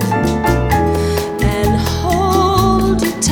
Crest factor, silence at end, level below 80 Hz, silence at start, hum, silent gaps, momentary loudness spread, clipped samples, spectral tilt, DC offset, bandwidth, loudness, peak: 14 dB; 0 s; -24 dBFS; 0 s; none; none; 4 LU; under 0.1%; -5.5 dB/octave; under 0.1%; over 20 kHz; -15 LUFS; 0 dBFS